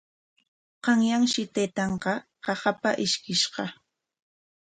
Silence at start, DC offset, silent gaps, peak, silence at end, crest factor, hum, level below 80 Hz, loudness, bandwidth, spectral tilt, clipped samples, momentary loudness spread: 0.85 s; under 0.1%; none; -8 dBFS; 0.95 s; 20 dB; none; -64 dBFS; -26 LUFS; 9.4 kHz; -3.5 dB/octave; under 0.1%; 9 LU